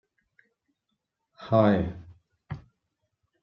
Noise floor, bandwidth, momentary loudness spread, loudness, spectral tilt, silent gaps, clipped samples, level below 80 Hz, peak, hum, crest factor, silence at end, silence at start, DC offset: -81 dBFS; 6 kHz; 24 LU; -24 LUFS; -9.5 dB/octave; none; under 0.1%; -56 dBFS; -6 dBFS; none; 24 dB; 0.85 s; 1.4 s; under 0.1%